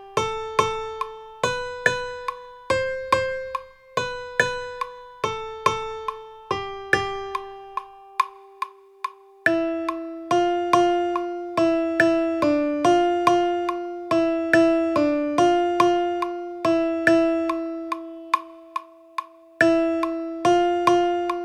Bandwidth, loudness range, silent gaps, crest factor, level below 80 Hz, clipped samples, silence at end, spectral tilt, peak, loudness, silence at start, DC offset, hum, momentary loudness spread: 12.5 kHz; 7 LU; none; 22 dB; -54 dBFS; under 0.1%; 0 s; -4.5 dB/octave; -2 dBFS; -23 LUFS; 0 s; under 0.1%; none; 15 LU